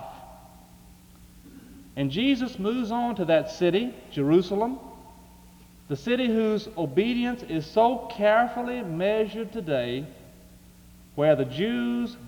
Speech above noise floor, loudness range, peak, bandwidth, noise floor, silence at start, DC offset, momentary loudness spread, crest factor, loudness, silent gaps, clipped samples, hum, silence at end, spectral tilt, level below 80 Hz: 26 dB; 3 LU; -8 dBFS; over 20 kHz; -51 dBFS; 0 s; under 0.1%; 11 LU; 18 dB; -26 LUFS; none; under 0.1%; none; 0 s; -6.5 dB/octave; -56 dBFS